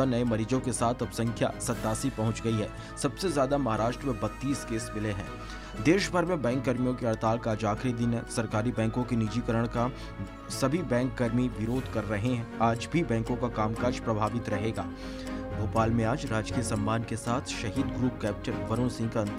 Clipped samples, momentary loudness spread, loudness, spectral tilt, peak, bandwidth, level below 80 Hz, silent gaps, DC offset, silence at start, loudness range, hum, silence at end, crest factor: under 0.1%; 6 LU; -30 LUFS; -6 dB/octave; -10 dBFS; 15.5 kHz; -46 dBFS; none; under 0.1%; 0 s; 2 LU; none; 0 s; 20 dB